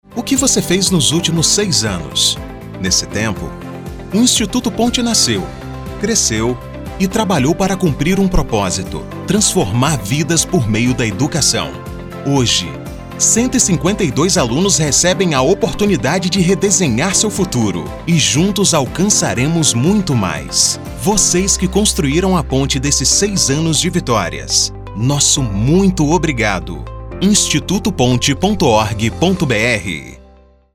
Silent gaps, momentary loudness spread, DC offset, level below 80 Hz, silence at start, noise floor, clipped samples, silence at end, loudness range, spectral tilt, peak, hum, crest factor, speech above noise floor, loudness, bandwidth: none; 9 LU; under 0.1%; -30 dBFS; 0.1 s; -45 dBFS; under 0.1%; 0.55 s; 3 LU; -3.5 dB/octave; 0 dBFS; none; 14 dB; 31 dB; -14 LUFS; 17.5 kHz